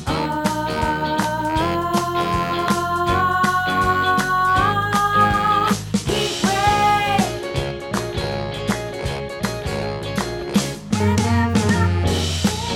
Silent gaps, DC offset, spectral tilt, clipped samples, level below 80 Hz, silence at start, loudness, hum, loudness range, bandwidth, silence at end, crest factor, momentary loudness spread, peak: none; under 0.1%; -5 dB/octave; under 0.1%; -36 dBFS; 0 s; -20 LUFS; none; 6 LU; 17.5 kHz; 0 s; 16 dB; 8 LU; -4 dBFS